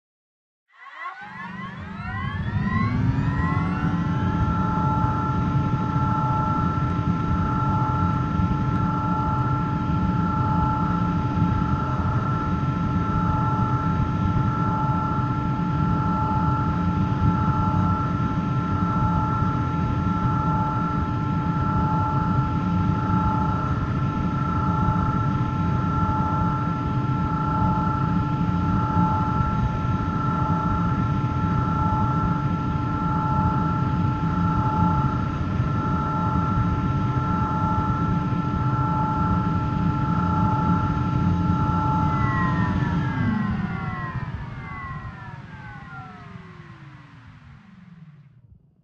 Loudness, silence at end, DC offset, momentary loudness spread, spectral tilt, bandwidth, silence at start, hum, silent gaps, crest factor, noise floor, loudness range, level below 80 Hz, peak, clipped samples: -23 LUFS; 0.6 s; under 0.1%; 6 LU; -9 dB/octave; 7 kHz; 0.8 s; none; none; 14 dB; -53 dBFS; 3 LU; -36 dBFS; -8 dBFS; under 0.1%